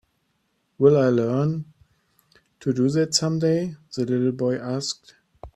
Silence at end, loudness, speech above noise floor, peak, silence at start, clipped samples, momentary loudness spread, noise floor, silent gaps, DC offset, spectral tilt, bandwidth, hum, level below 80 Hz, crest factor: 0.05 s; -22 LUFS; 49 dB; -4 dBFS; 0.8 s; under 0.1%; 13 LU; -71 dBFS; none; under 0.1%; -5.5 dB/octave; 13 kHz; none; -58 dBFS; 20 dB